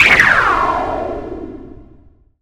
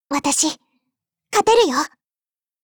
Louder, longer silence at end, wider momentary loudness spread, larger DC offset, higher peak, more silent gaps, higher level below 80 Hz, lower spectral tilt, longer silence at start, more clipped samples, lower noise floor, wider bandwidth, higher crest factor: first, -13 LUFS vs -18 LUFS; second, 0.6 s vs 0.75 s; first, 22 LU vs 12 LU; neither; first, 0 dBFS vs -4 dBFS; neither; first, -36 dBFS vs -56 dBFS; first, -3.5 dB/octave vs -1 dB/octave; about the same, 0 s vs 0.1 s; neither; second, -46 dBFS vs under -90 dBFS; about the same, over 20 kHz vs over 20 kHz; about the same, 16 dB vs 16 dB